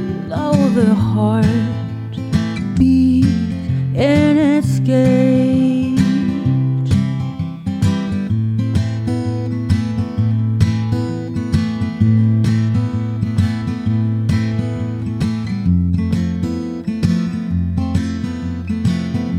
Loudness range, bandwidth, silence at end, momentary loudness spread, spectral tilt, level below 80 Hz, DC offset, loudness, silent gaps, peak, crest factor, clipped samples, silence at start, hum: 5 LU; 11 kHz; 0 s; 9 LU; -8 dB/octave; -36 dBFS; under 0.1%; -17 LUFS; none; 0 dBFS; 16 dB; under 0.1%; 0 s; none